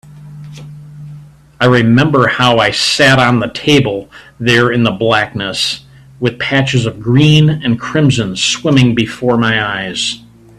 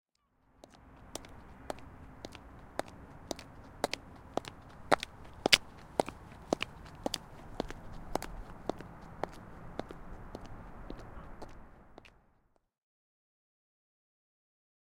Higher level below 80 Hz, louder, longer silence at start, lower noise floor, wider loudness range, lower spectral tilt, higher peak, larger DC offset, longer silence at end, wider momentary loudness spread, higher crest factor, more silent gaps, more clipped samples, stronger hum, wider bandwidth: first, -44 dBFS vs -54 dBFS; first, -11 LUFS vs -37 LUFS; second, 0.1 s vs 0.55 s; second, -35 dBFS vs -72 dBFS; second, 3 LU vs 19 LU; first, -5 dB/octave vs -3 dB/octave; about the same, 0 dBFS vs -2 dBFS; neither; second, 0.4 s vs 2.7 s; second, 17 LU vs 21 LU; second, 12 dB vs 38 dB; neither; neither; neither; second, 13 kHz vs 16.5 kHz